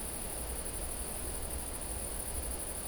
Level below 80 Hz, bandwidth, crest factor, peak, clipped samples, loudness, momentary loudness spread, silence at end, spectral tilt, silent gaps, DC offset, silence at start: -44 dBFS; over 20 kHz; 14 dB; -24 dBFS; under 0.1%; -37 LUFS; 1 LU; 0 s; -3 dB/octave; none; under 0.1%; 0 s